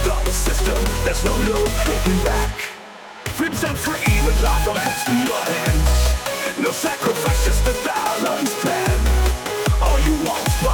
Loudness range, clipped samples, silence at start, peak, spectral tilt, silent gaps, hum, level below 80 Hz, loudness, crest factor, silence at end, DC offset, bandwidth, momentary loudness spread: 2 LU; under 0.1%; 0 s; -6 dBFS; -4.5 dB/octave; none; none; -22 dBFS; -20 LUFS; 14 dB; 0 s; under 0.1%; 19.5 kHz; 4 LU